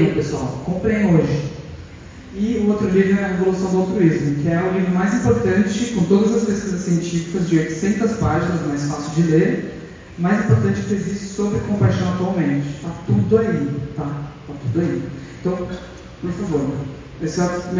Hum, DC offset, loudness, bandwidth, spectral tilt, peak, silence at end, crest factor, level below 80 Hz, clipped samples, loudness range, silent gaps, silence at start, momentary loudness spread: none; under 0.1%; -19 LUFS; 7.6 kHz; -7 dB/octave; -2 dBFS; 0 s; 16 dB; -40 dBFS; under 0.1%; 5 LU; none; 0 s; 13 LU